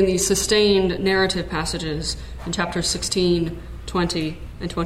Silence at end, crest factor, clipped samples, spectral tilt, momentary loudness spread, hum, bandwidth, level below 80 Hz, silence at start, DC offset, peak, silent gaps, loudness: 0 s; 16 dB; under 0.1%; -4 dB/octave; 12 LU; none; 16 kHz; -36 dBFS; 0 s; under 0.1%; -4 dBFS; none; -21 LUFS